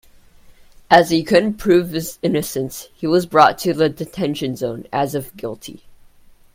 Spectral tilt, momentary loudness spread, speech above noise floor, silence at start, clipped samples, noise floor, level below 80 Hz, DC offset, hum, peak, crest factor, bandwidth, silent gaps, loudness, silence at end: -5 dB/octave; 15 LU; 30 dB; 0.9 s; under 0.1%; -47 dBFS; -50 dBFS; under 0.1%; none; 0 dBFS; 18 dB; 16.5 kHz; none; -18 LUFS; 0.75 s